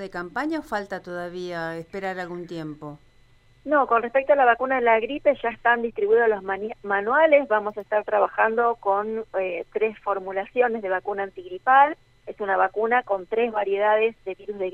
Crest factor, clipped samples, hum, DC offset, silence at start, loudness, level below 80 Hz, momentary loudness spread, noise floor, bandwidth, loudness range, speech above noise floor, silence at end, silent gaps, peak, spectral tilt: 18 dB; under 0.1%; none; under 0.1%; 0 s; -23 LUFS; -60 dBFS; 14 LU; -56 dBFS; 8.4 kHz; 6 LU; 33 dB; 0 s; none; -6 dBFS; -6 dB/octave